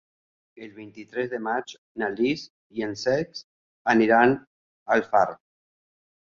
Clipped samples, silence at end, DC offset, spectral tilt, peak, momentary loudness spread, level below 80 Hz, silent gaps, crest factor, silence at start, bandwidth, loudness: under 0.1%; 0.95 s; under 0.1%; -5.5 dB/octave; -4 dBFS; 23 LU; -64 dBFS; 1.78-1.95 s, 2.50-2.70 s, 3.44-3.85 s, 4.47-4.86 s; 22 dB; 0.6 s; 7.4 kHz; -24 LUFS